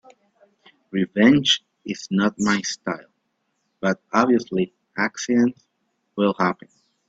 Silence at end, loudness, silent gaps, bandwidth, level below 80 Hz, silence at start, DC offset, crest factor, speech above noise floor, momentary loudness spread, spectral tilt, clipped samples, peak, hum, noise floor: 0.55 s; -21 LUFS; none; 8 kHz; -62 dBFS; 0.95 s; under 0.1%; 22 dB; 52 dB; 13 LU; -4.5 dB/octave; under 0.1%; -2 dBFS; none; -73 dBFS